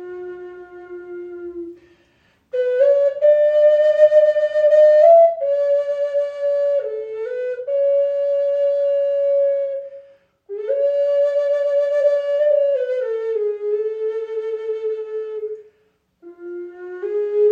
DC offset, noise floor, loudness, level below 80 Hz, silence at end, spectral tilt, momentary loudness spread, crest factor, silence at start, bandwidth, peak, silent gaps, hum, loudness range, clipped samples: under 0.1%; -63 dBFS; -18 LUFS; -72 dBFS; 0 s; -4.5 dB/octave; 20 LU; 16 dB; 0 s; 5 kHz; -2 dBFS; none; none; 11 LU; under 0.1%